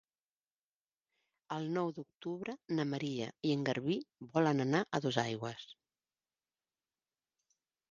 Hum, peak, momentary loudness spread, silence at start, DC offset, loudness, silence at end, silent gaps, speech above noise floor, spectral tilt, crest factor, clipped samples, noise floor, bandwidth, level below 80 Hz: none; -16 dBFS; 12 LU; 1.5 s; under 0.1%; -37 LUFS; 2.2 s; none; over 54 dB; -6 dB/octave; 24 dB; under 0.1%; under -90 dBFS; 7.4 kHz; -80 dBFS